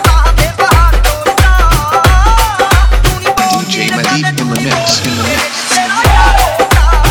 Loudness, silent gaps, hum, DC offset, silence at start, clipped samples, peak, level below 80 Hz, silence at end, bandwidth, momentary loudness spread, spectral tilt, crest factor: -10 LUFS; none; none; under 0.1%; 0 s; 0.6%; 0 dBFS; -12 dBFS; 0 s; 19.5 kHz; 4 LU; -4 dB/octave; 8 dB